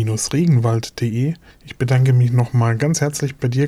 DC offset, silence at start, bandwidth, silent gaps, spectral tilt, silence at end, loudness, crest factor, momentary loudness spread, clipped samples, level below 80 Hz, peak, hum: under 0.1%; 0 s; 14 kHz; none; -6 dB/octave; 0 s; -18 LUFS; 12 dB; 8 LU; under 0.1%; -48 dBFS; -6 dBFS; none